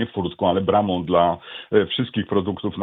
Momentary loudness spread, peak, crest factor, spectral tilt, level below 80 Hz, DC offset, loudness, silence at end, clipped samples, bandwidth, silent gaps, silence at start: 6 LU; -4 dBFS; 18 dB; -9.5 dB/octave; -52 dBFS; under 0.1%; -21 LUFS; 0 s; under 0.1%; 4.1 kHz; none; 0 s